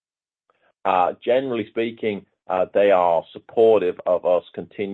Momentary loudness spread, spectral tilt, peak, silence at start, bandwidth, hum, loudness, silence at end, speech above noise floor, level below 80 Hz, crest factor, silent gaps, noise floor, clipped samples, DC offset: 11 LU; -7.5 dB/octave; -4 dBFS; 0.85 s; 4.1 kHz; none; -21 LUFS; 0 s; 52 dB; -68 dBFS; 16 dB; none; -73 dBFS; under 0.1%; under 0.1%